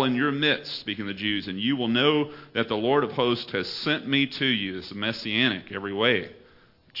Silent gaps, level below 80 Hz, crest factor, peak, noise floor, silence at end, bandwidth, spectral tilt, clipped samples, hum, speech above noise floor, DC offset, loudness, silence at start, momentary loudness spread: none; -66 dBFS; 20 dB; -6 dBFS; -56 dBFS; 0 s; 5.8 kHz; -6.5 dB/octave; under 0.1%; none; 31 dB; under 0.1%; -25 LUFS; 0 s; 9 LU